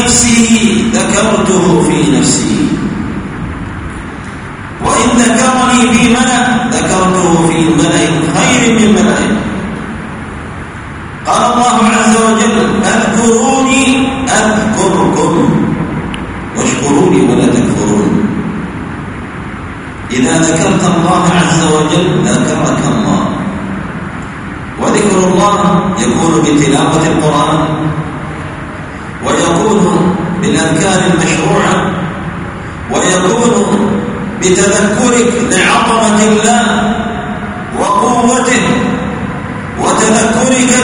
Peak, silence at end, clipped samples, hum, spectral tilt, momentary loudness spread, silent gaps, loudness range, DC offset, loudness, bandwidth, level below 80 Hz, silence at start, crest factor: 0 dBFS; 0 s; 0.2%; none; -4.5 dB/octave; 14 LU; none; 4 LU; under 0.1%; -10 LUFS; 11 kHz; -32 dBFS; 0 s; 10 dB